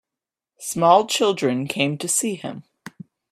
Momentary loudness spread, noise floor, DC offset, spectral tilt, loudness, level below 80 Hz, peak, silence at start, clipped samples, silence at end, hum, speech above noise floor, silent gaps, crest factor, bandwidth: 21 LU; -88 dBFS; under 0.1%; -3.5 dB/octave; -20 LUFS; -68 dBFS; -2 dBFS; 0.6 s; under 0.1%; 0.4 s; none; 68 dB; none; 20 dB; 15.5 kHz